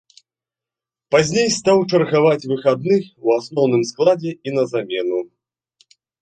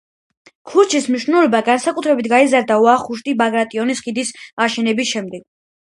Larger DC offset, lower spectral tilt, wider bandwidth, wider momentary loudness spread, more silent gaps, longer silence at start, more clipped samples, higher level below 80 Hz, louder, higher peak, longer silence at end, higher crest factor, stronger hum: neither; first, -5 dB/octave vs -3.5 dB/octave; second, 9.2 kHz vs 11.5 kHz; second, 7 LU vs 10 LU; second, none vs 4.53-4.57 s; first, 1.1 s vs 0.65 s; neither; about the same, -60 dBFS vs -64 dBFS; about the same, -18 LUFS vs -16 LUFS; about the same, -2 dBFS vs 0 dBFS; first, 0.95 s vs 0.55 s; about the same, 18 dB vs 16 dB; neither